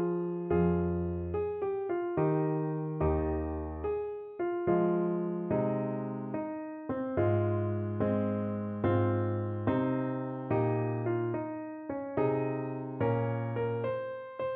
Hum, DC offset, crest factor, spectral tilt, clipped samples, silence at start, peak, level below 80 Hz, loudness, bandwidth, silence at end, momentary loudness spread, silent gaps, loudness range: none; under 0.1%; 14 dB; -9 dB/octave; under 0.1%; 0 s; -16 dBFS; -50 dBFS; -32 LUFS; 4 kHz; 0 s; 8 LU; none; 2 LU